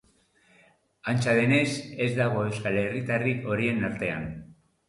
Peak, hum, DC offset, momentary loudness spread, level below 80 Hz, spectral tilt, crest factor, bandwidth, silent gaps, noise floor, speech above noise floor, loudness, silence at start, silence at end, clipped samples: -12 dBFS; none; under 0.1%; 10 LU; -58 dBFS; -6 dB/octave; 16 dB; 11.5 kHz; none; -64 dBFS; 37 dB; -27 LUFS; 1.05 s; 0.35 s; under 0.1%